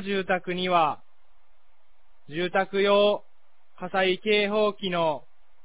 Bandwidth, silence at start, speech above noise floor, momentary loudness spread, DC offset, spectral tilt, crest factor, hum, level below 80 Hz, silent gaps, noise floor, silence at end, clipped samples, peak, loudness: 4 kHz; 0 s; 44 dB; 12 LU; 0.8%; -8.5 dB/octave; 16 dB; none; -66 dBFS; none; -68 dBFS; 0.45 s; under 0.1%; -10 dBFS; -25 LUFS